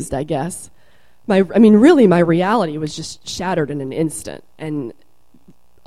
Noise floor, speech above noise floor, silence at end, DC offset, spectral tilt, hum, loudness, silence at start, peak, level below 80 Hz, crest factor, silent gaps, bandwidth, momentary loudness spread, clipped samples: -55 dBFS; 40 dB; 0.95 s; 0.7%; -6 dB/octave; none; -16 LUFS; 0 s; 0 dBFS; -48 dBFS; 16 dB; none; 13.5 kHz; 20 LU; under 0.1%